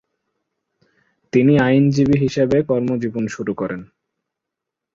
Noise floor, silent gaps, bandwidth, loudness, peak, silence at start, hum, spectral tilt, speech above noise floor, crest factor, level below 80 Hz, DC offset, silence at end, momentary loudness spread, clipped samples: -83 dBFS; none; 7.6 kHz; -18 LUFS; -2 dBFS; 1.35 s; none; -7.5 dB/octave; 66 dB; 16 dB; -50 dBFS; under 0.1%; 1.1 s; 11 LU; under 0.1%